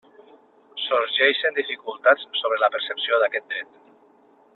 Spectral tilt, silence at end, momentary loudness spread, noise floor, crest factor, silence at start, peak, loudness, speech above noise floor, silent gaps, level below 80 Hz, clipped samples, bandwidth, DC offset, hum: -4 dB/octave; 0.9 s; 13 LU; -56 dBFS; 20 dB; 0.75 s; -4 dBFS; -22 LUFS; 34 dB; none; -76 dBFS; under 0.1%; 4.4 kHz; under 0.1%; none